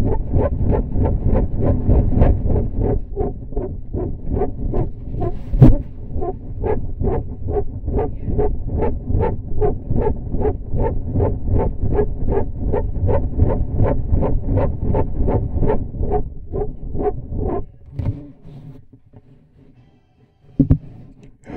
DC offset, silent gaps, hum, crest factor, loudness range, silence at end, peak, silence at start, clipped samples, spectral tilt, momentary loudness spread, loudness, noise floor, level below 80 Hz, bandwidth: under 0.1%; none; none; 18 dB; 6 LU; 0 s; 0 dBFS; 0 s; under 0.1%; -12.5 dB/octave; 10 LU; -21 LUFS; -54 dBFS; -22 dBFS; 3 kHz